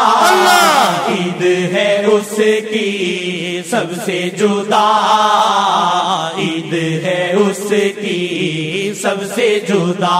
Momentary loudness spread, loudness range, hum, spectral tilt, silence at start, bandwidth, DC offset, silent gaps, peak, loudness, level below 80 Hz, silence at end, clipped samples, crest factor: 9 LU; 3 LU; none; -4 dB/octave; 0 s; 16 kHz; under 0.1%; none; 0 dBFS; -14 LUFS; -62 dBFS; 0 s; under 0.1%; 14 dB